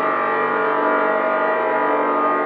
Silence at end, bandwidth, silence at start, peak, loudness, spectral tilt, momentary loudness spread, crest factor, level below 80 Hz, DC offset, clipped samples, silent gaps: 0 s; 5.2 kHz; 0 s; -6 dBFS; -18 LUFS; -8 dB/octave; 1 LU; 12 dB; -80 dBFS; under 0.1%; under 0.1%; none